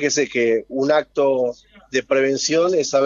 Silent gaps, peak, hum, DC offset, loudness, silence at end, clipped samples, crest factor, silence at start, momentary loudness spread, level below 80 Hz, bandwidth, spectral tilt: none; -6 dBFS; none; under 0.1%; -19 LUFS; 0 s; under 0.1%; 14 dB; 0 s; 6 LU; -60 dBFS; 7.6 kHz; -3 dB/octave